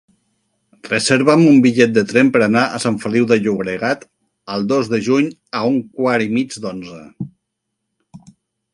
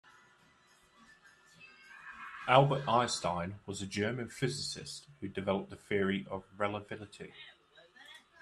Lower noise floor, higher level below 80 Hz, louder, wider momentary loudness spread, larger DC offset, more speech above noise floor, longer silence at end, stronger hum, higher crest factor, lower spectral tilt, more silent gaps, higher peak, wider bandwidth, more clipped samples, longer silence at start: first, -76 dBFS vs -66 dBFS; first, -58 dBFS vs -70 dBFS; first, -16 LUFS vs -34 LUFS; second, 16 LU vs 25 LU; neither; first, 60 dB vs 32 dB; first, 0.55 s vs 0.25 s; neither; second, 16 dB vs 28 dB; about the same, -5.5 dB/octave vs -5 dB/octave; neither; first, 0 dBFS vs -10 dBFS; about the same, 11.5 kHz vs 12.5 kHz; neither; second, 0.85 s vs 1.6 s